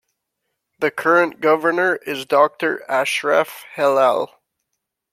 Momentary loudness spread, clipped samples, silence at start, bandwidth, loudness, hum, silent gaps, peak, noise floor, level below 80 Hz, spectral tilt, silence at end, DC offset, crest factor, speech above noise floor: 8 LU; under 0.1%; 0.8 s; 16 kHz; -18 LUFS; none; none; -2 dBFS; -78 dBFS; -74 dBFS; -4 dB/octave; 0.85 s; under 0.1%; 18 dB; 60 dB